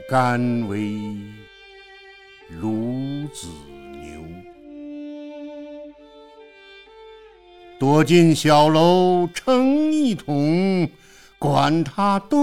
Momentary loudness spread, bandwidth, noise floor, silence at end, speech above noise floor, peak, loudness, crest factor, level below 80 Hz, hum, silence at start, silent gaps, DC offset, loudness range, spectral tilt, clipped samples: 24 LU; 16 kHz; -46 dBFS; 0 s; 28 dB; -2 dBFS; -19 LUFS; 18 dB; -54 dBFS; none; 0 s; none; under 0.1%; 21 LU; -6.5 dB/octave; under 0.1%